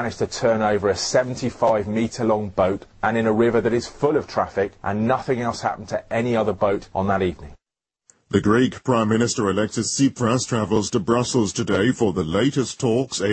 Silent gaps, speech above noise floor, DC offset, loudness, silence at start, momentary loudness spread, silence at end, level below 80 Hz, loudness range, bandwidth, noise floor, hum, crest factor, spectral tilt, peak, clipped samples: none; 62 dB; under 0.1%; -21 LUFS; 0 s; 5 LU; 0 s; -50 dBFS; 3 LU; 8.8 kHz; -83 dBFS; none; 18 dB; -5 dB/octave; -2 dBFS; under 0.1%